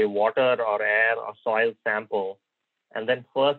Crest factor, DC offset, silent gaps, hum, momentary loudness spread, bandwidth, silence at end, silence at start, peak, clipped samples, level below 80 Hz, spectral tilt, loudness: 16 dB; under 0.1%; none; none; 9 LU; 4.4 kHz; 0 s; 0 s; -8 dBFS; under 0.1%; -88 dBFS; -7 dB/octave; -24 LUFS